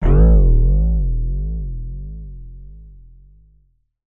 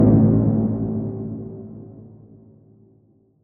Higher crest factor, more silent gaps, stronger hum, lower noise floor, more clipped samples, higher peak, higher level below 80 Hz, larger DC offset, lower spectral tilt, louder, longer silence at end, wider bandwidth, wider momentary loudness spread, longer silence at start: about the same, 16 dB vs 18 dB; neither; neither; about the same, -58 dBFS vs -57 dBFS; neither; about the same, -2 dBFS vs -4 dBFS; first, -18 dBFS vs -42 dBFS; neither; second, -12.5 dB/octave vs -15 dB/octave; about the same, -18 LUFS vs -20 LUFS; second, 1.2 s vs 1.35 s; about the same, 2.3 kHz vs 2.1 kHz; about the same, 25 LU vs 24 LU; about the same, 0 s vs 0 s